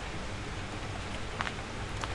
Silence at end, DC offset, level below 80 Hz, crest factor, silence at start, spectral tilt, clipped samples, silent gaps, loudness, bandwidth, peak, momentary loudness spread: 0 s; under 0.1%; -44 dBFS; 24 dB; 0 s; -4.5 dB/octave; under 0.1%; none; -38 LUFS; 11.5 kHz; -14 dBFS; 3 LU